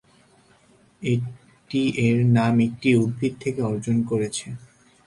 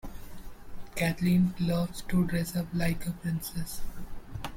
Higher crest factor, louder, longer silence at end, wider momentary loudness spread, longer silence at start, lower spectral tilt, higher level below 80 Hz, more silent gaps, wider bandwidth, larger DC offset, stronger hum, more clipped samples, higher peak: about the same, 16 dB vs 14 dB; first, -23 LUFS vs -30 LUFS; first, 0.5 s vs 0 s; second, 13 LU vs 21 LU; first, 1 s vs 0.05 s; about the same, -6.5 dB/octave vs -6 dB/octave; second, -58 dBFS vs -44 dBFS; neither; second, 11.5 kHz vs 16.5 kHz; neither; neither; neither; first, -6 dBFS vs -14 dBFS